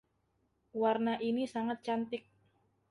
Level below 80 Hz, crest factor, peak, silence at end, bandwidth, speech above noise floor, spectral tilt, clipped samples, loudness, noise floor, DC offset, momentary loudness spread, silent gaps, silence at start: -78 dBFS; 18 dB; -18 dBFS; 0.7 s; 11 kHz; 43 dB; -6 dB/octave; under 0.1%; -35 LUFS; -77 dBFS; under 0.1%; 11 LU; none; 0.75 s